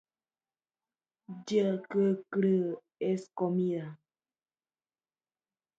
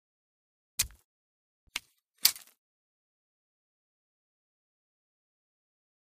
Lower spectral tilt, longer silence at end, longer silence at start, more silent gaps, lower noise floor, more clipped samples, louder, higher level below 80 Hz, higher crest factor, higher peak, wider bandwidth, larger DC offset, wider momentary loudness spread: first, -8 dB/octave vs 2 dB/octave; second, 1.85 s vs 3.7 s; first, 1.3 s vs 0.8 s; second, none vs 1.05-1.67 s; about the same, under -90 dBFS vs under -90 dBFS; neither; about the same, -31 LUFS vs -31 LUFS; second, -82 dBFS vs -62 dBFS; second, 18 dB vs 40 dB; second, -16 dBFS vs 0 dBFS; second, 7.8 kHz vs 15.5 kHz; neither; second, 11 LU vs 14 LU